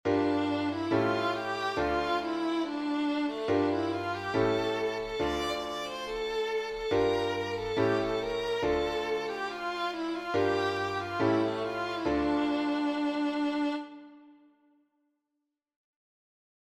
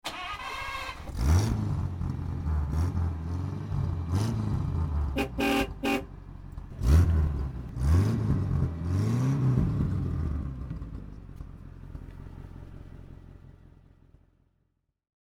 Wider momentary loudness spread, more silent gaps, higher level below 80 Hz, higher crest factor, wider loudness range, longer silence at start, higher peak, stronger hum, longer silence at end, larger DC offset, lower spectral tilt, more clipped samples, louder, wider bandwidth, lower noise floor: second, 5 LU vs 20 LU; neither; second, -54 dBFS vs -34 dBFS; about the same, 16 dB vs 18 dB; second, 3 LU vs 19 LU; about the same, 0.05 s vs 0.05 s; second, -14 dBFS vs -10 dBFS; neither; first, 2.45 s vs 1.75 s; neither; second, -5.5 dB/octave vs -7 dB/octave; neither; about the same, -30 LUFS vs -29 LUFS; second, 13.5 kHz vs 16 kHz; first, -85 dBFS vs -75 dBFS